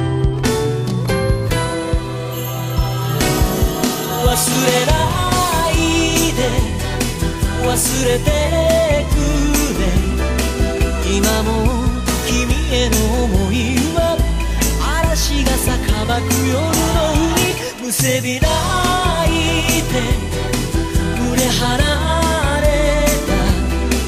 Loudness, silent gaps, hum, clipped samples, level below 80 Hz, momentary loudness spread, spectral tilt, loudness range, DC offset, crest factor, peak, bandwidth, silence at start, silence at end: -16 LUFS; none; none; under 0.1%; -22 dBFS; 5 LU; -4.5 dB/octave; 2 LU; under 0.1%; 16 dB; 0 dBFS; 15.5 kHz; 0 s; 0 s